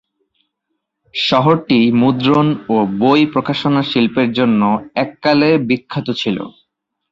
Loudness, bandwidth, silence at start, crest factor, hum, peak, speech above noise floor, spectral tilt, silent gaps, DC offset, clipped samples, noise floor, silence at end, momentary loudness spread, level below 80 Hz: -15 LUFS; 7.6 kHz; 1.15 s; 14 dB; none; -2 dBFS; 60 dB; -7 dB/octave; none; under 0.1%; under 0.1%; -74 dBFS; 0.6 s; 8 LU; -54 dBFS